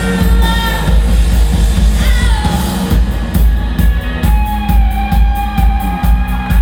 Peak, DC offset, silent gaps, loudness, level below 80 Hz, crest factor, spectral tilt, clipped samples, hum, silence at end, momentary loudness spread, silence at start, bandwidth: 0 dBFS; under 0.1%; none; -13 LUFS; -12 dBFS; 10 dB; -6 dB/octave; under 0.1%; none; 0 s; 2 LU; 0 s; 17 kHz